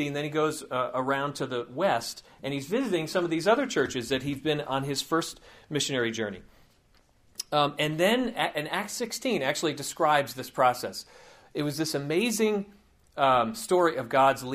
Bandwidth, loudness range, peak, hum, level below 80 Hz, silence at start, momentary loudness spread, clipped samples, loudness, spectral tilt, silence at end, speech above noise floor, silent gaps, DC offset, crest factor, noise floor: 15.5 kHz; 3 LU; -8 dBFS; none; -62 dBFS; 0 s; 10 LU; under 0.1%; -28 LUFS; -4 dB/octave; 0 s; 35 dB; none; under 0.1%; 20 dB; -63 dBFS